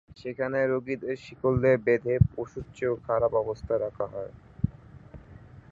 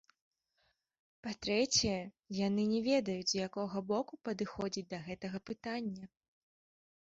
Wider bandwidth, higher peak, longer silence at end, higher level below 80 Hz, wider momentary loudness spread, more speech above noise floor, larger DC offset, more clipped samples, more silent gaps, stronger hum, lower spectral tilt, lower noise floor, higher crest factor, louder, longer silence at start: about the same, 7.6 kHz vs 7.6 kHz; first, -6 dBFS vs -18 dBFS; second, 0.1 s vs 0.95 s; first, -46 dBFS vs -64 dBFS; about the same, 13 LU vs 12 LU; second, 22 dB vs 43 dB; neither; neither; neither; neither; first, -9 dB/octave vs -4 dB/octave; second, -49 dBFS vs -79 dBFS; about the same, 22 dB vs 20 dB; first, -28 LUFS vs -36 LUFS; second, 0.1 s vs 1.25 s